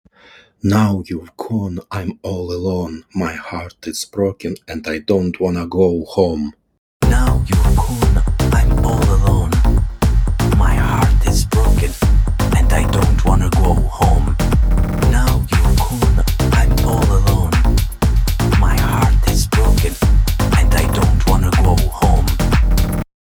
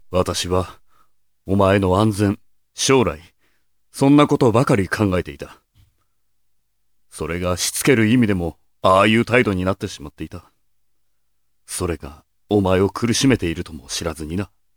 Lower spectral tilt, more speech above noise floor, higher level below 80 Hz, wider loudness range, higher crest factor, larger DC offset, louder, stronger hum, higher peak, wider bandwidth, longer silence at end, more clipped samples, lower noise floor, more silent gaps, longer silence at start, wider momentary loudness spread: about the same, -6 dB/octave vs -5 dB/octave; second, 30 dB vs 56 dB; first, -16 dBFS vs -44 dBFS; about the same, 6 LU vs 6 LU; second, 14 dB vs 20 dB; neither; about the same, -16 LUFS vs -18 LUFS; neither; about the same, 0 dBFS vs 0 dBFS; second, 18 kHz vs 20 kHz; about the same, 0.3 s vs 0.3 s; neither; second, -47 dBFS vs -74 dBFS; first, 6.78-7.00 s vs none; first, 0.65 s vs 0.1 s; second, 9 LU vs 18 LU